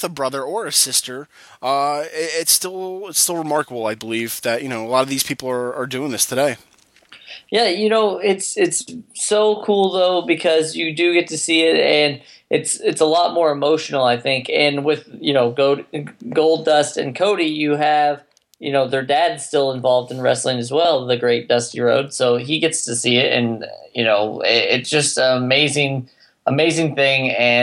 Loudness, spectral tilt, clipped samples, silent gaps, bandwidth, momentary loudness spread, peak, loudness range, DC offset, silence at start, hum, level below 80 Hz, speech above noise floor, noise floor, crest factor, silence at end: -18 LUFS; -3 dB/octave; under 0.1%; none; 16 kHz; 8 LU; -2 dBFS; 4 LU; under 0.1%; 0 s; none; -70 dBFS; 30 dB; -48 dBFS; 18 dB; 0 s